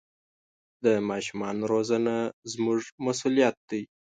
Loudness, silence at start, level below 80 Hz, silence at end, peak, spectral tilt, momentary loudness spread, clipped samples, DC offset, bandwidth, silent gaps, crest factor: -28 LUFS; 0.8 s; -70 dBFS; 0.3 s; -10 dBFS; -5 dB/octave; 9 LU; under 0.1%; under 0.1%; 9.4 kHz; 2.33-2.42 s, 2.92-2.98 s, 3.57-3.68 s; 18 dB